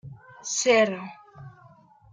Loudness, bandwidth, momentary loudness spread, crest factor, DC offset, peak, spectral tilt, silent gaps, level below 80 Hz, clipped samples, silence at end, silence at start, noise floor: -23 LUFS; 10 kHz; 25 LU; 20 dB; under 0.1%; -8 dBFS; -2.5 dB/octave; none; -66 dBFS; under 0.1%; 0.65 s; 0.05 s; -54 dBFS